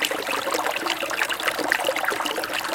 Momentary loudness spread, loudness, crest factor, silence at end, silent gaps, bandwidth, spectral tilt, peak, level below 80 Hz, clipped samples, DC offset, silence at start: 3 LU; -24 LUFS; 22 dB; 0 s; none; 17 kHz; -1 dB/octave; -2 dBFS; -62 dBFS; under 0.1%; under 0.1%; 0 s